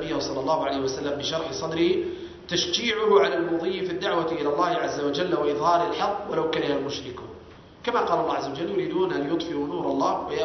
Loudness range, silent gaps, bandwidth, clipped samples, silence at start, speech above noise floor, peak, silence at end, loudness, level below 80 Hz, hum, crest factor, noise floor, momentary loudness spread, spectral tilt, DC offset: 3 LU; none; 6.4 kHz; under 0.1%; 0 s; 21 dB; -8 dBFS; 0 s; -25 LUFS; -56 dBFS; none; 18 dB; -46 dBFS; 7 LU; -4.5 dB/octave; under 0.1%